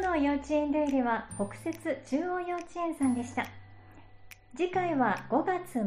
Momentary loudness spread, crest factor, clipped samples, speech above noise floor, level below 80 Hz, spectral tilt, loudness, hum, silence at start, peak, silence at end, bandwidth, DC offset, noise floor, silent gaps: 8 LU; 16 dB; under 0.1%; 21 dB; -56 dBFS; -5.5 dB/octave; -31 LUFS; none; 0 s; -14 dBFS; 0 s; 15 kHz; under 0.1%; -52 dBFS; none